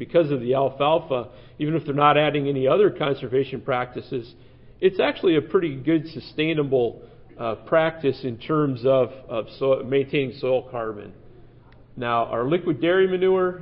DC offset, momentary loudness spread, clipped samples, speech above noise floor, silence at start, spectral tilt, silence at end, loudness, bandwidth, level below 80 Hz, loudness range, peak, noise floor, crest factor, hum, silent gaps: under 0.1%; 11 LU; under 0.1%; 26 dB; 0 s; -11 dB/octave; 0 s; -23 LUFS; 5.6 kHz; -54 dBFS; 4 LU; -4 dBFS; -49 dBFS; 18 dB; none; none